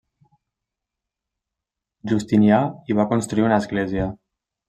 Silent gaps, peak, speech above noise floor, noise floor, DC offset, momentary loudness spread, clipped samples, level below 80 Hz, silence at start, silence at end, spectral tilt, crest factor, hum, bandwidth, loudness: none; -4 dBFS; 66 dB; -85 dBFS; under 0.1%; 10 LU; under 0.1%; -50 dBFS; 2.05 s; 0.55 s; -7 dB/octave; 20 dB; none; 9 kHz; -20 LUFS